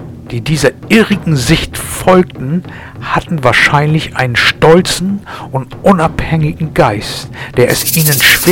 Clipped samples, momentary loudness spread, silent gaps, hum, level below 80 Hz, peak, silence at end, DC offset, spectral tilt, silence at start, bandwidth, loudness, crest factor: 1%; 13 LU; none; none; -32 dBFS; 0 dBFS; 0 s; under 0.1%; -4.5 dB/octave; 0 s; 19 kHz; -11 LUFS; 12 dB